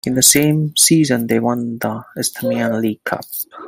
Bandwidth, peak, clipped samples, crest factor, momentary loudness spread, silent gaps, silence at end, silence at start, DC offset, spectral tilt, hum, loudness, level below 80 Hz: 17 kHz; 0 dBFS; under 0.1%; 16 dB; 13 LU; none; 0 s; 0.05 s; under 0.1%; -3.5 dB/octave; none; -15 LUFS; -54 dBFS